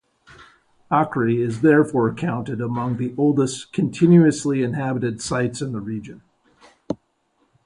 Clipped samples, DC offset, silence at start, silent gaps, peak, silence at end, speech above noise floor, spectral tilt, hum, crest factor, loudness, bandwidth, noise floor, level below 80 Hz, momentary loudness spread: under 0.1%; under 0.1%; 0.4 s; none; -4 dBFS; 0.7 s; 47 dB; -7 dB/octave; none; 18 dB; -20 LUFS; 11 kHz; -66 dBFS; -56 dBFS; 16 LU